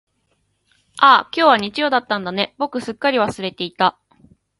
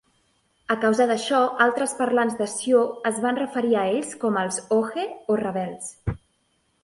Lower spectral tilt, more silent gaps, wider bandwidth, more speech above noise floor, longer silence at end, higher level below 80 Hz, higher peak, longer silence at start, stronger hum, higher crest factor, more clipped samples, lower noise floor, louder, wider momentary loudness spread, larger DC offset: about the same, -4.5 dB/octave vs -4.5 dB/octave; neither; about the same, 11.5 kHz vs 11.5 kHz; about the same, 49 dB vs 46 dB; about the same, 0.7 s vs 0.7 s; second, -60 dBFS vs -50 dBFS; first, 0 dBFS vs -6 dBFS; first, 0.95 s vs 0.7 s; neither; about the same, 20 dB vs 18 dB; neither; about the same, -67 dBFS vs -68 dBFS; first, -17 LUFS vs -23 LUFS; about the same, 12 LU vs 11 LU; neither